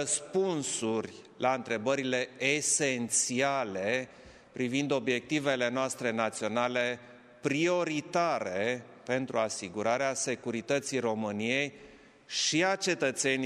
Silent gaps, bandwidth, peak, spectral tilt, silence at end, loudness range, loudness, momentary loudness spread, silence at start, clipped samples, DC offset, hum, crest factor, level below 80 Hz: none; 14 kHz; -12 dBFS; -3 dB/octave; 0 s; 2 LU; -30 LUFS; 6 LU; 0 s; under 0.1%; under 0.1%; none; 18 dB; -74 dBFS